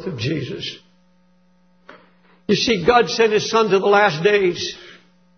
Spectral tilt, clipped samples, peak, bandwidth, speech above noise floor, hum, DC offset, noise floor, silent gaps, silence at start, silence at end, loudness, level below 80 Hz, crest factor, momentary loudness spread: -4.5 dB/octave; under 0.1%; -2 dBFS; 6.6 kHz; 41 dB; none; under 0.1%; -58 dBFS; none; 0 s; 0.45 s; -17 LUFS; -52 dBFS; 18 dB; 14 LU